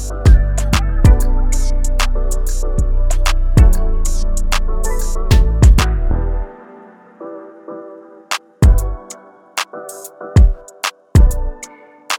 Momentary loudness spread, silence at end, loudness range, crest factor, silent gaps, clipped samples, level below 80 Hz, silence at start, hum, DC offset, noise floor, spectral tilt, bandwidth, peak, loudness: 19 LU; 0 s; 6 LU; 12 dB; none; under 0.1%; -14 dBFS; 0 s; none; under 0.1%; -40 dBFS; -5 dB/octave; 15.5 kHz; 0 dBFS; -16 LUFS